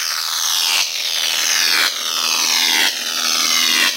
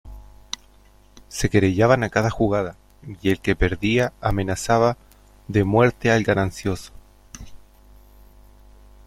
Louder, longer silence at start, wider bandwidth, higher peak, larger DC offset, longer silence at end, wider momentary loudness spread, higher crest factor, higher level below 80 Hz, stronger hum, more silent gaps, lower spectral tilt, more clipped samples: first, -14 LUFS vs -21 LUFS; about the same, 0 s vs 0.05 s; about the same, 16 kHz vs 15.5 kHz; about the same, -2 dBFS vs -2 dBFS; neither; second, 0 s vs 1.5 s; second, 5 LU vs 17 LU; about the same, 16 dB vs 20 dB; second, under -90 dBFS vs -38 dBFS; second, none vs 50 Hz at -40 dBFS; neither; second, 4 dB/octave vs -6 dB/octave; neither